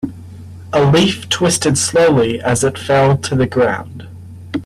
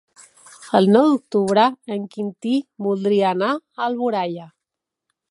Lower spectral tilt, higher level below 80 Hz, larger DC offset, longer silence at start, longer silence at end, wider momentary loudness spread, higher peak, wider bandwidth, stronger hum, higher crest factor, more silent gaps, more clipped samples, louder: second, -4.5 dB/octave vs -6.5 dB/octave; first, -44 dBFS vs -72 dBFS; neither; second, 0.05 s vs 0.6 s; second, 0 s vs 0.85 s; first, 23 LU vs 13 LU; about the same, -2 dBFS vs -2 dBFS; first, 14 kHz vs 11.5 kHz; neither; second, 14 dB vs 20 dB; neither; neither; first, -14 LUFS vs -20 LUFS